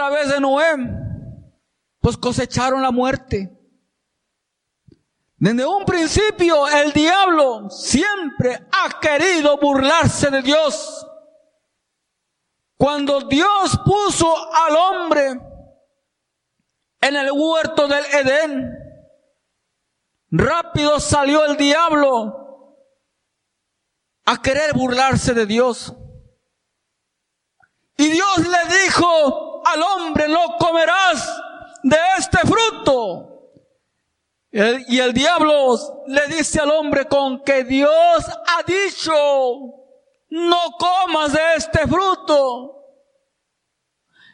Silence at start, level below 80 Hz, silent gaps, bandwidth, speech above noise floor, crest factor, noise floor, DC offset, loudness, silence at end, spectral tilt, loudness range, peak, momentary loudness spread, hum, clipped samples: 0 s; -42 dBFS; none; 11.5 kHz; 60 dB; 18 dB; -77 dBFS; under 0.1%; -17 LUFS; 1.6 s; -4 dB/octave; 5 LU; 0 dBFS; 9 LU; none; under 0.1%